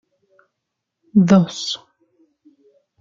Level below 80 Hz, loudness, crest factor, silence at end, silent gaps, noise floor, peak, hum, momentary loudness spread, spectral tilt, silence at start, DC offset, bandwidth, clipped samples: -60 dBFS; -17 LUFS; 20 dB; 1.25 s; none; -79 dBFS; -2 dBFS; none; 13 LU; -6.5 dB/octave; 1.15 s; under 0.1%; 7.6 kHz; under 0.1%